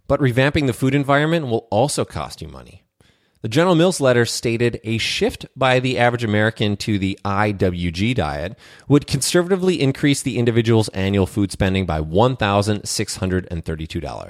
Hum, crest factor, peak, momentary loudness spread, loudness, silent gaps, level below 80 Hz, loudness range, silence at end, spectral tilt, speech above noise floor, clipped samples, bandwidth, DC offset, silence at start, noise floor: none; 18 dB; -2 dBFS; 8 LU; -19 LUFS; none; -40 dBFS; 2 LU; 0 s; -5.5 dB/octave; 39 dB; under 0.1%; 16 kHz; under 0.1%; 0.1 s; -58 dBFS